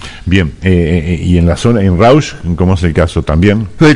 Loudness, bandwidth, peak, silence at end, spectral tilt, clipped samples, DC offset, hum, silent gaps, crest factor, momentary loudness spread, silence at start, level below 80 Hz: -11 LUFS; 11 kHz; 0 dBFS; 0 s; -7 dB/octave; 1%; under 0.1%; none; none; 10 dB; 5 LU; 0 s; -26 dBFS